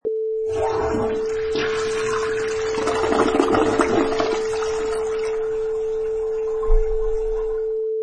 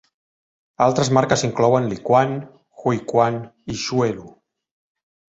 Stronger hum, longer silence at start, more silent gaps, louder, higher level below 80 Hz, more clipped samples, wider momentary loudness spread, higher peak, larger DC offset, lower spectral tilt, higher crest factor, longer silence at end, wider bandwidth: neither; second, 0.05 s vs 0.8 s; neither; about the same, -22 LUFS vs -20 LUFS; first, -30 dBFS vs -56 dBFS; neither; second, 6 LU vs 11 LU; about the same, -2 dBFS vs -2 dBFS; neither; about the same, -5 dB/octave vs -5.5 dB/octave; about the same, 20 dB vs 20 dB; second, 0 s vs 1.1 s; first, 10 kHz vs 8.2 kHz